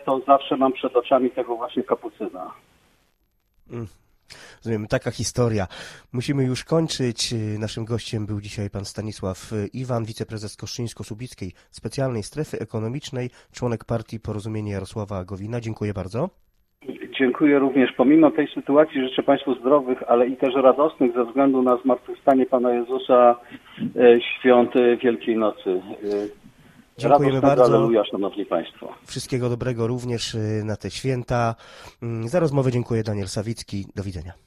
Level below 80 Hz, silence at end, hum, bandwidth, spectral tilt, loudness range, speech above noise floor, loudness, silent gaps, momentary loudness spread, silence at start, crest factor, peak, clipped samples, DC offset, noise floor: -52 dBFS; 0.15 s; none; 14 kHz; -6 dB/octave; 11 LU; 46 dB; -22 LUFS; none; 16 LU; 0 s; 20 dB; -2 dBFS; under 0.1%; under 0.1%; -67 dBFS